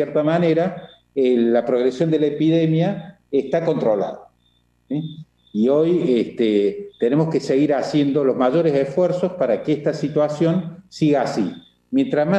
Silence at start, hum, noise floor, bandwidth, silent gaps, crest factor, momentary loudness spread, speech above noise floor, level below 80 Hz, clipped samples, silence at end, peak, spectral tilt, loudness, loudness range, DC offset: 0 s; none; -62 dBFS; 9 kHz; none; 14 dB; 10 LU; 43 dB; -62 dBFS; under 0.1%; 0 s; -6 dBFS; -8 dB/octave; -20 LUFS; 3 LU; under 0.1%